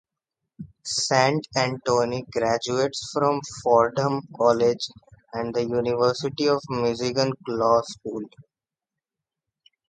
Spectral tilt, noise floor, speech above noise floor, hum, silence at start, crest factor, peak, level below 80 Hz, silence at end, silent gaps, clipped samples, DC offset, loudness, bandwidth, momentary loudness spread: -4.5 dB/octave; -89 dBFS; 66 dB; none; 0.6 s; 22 dB; -4 dBFS; -60 dBFS; 1.5 s; none; under 0.1%; under 0.1%; -24 LUFS; 9.4 kHz; 13 LU